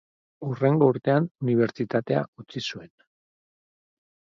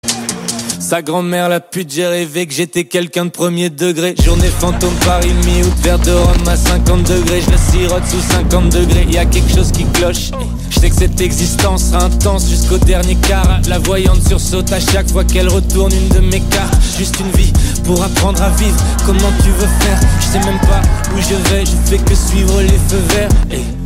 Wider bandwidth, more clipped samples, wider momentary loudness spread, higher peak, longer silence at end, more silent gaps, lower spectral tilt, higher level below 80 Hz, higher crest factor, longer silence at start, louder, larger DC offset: second, 7.4 kHz vs 16.5 kHz; neither; first, 14 LU vs 4 LU; second, -6 dBFS vs 0 dBFS; first, 1.5 s vs 0 s; first, 1.31-1.35 s, 2.28-2.33 s vs none; first, -7.5 dB/octave vs -4.5 dB/octave; second, -68 dBFS vs -14 dBFS; first, 20 dB vs 10 dB; first, 0.4 s vs 0.05 s; second, -25 LUFS vs -13 LUFS; neither